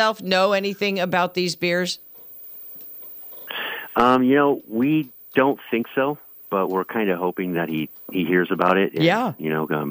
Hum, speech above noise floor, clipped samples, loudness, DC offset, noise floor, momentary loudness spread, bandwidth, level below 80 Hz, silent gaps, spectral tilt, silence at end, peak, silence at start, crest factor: none; 20 dB; under 0.1%; -21 LUFS; under 0.1%; -41 dBFS; 17 LU; 16 kHz; -62 dBFS; none; -5.5 dB/octave; 0 s; -4 dBFS; 0 s; 18 dB